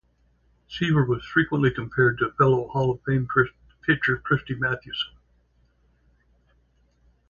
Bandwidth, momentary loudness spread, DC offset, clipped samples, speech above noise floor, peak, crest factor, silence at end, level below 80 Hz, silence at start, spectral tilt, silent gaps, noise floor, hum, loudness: 7 kHz; 8 LU; under 0.1%; under 0.1%; 41 dB; -6 dBFS; 20 dB; 2.2 s; -52 dBFS; 0.7 s; -7.5 dB/octave; none; -64 dBFS; none; -24 LUFS